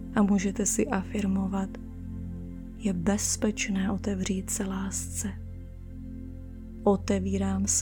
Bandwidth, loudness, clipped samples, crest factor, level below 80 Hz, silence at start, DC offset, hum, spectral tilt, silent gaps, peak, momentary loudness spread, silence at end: 19 kHz; -29 LUFS; under 0.1%; 18 dB; -44 dBFS; 0 s; under 0.1%; none; -4.5 dB/octave; none; -10 dBFS; 16 LU; 0 s